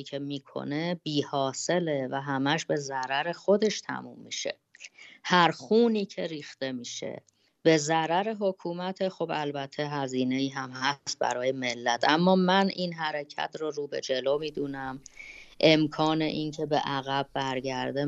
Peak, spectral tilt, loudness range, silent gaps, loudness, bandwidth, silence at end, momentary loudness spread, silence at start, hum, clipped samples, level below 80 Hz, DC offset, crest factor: -6 dBFS; -4.5 dB/octave; 3 LU; none; -28 LUFS; 8.2 kHz; 0 s; 13 LU; 0 s; none; under 0.1%; -68 dBFS; under 0.1%; 22 dB